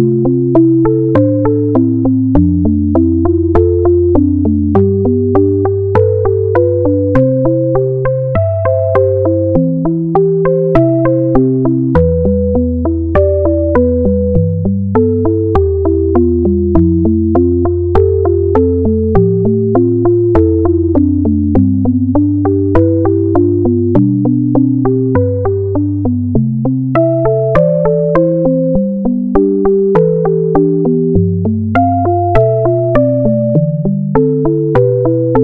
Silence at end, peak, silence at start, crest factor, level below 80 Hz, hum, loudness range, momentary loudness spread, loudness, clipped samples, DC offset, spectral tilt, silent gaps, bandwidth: 0 s; 0 dBFS; 0 s; 10 dB; -28 dBFS; none; 1 LU; 3 LU; -11 LUFS; 0.1%; under 0.1%; -12.5 dB/octave; none; 3.8 kHz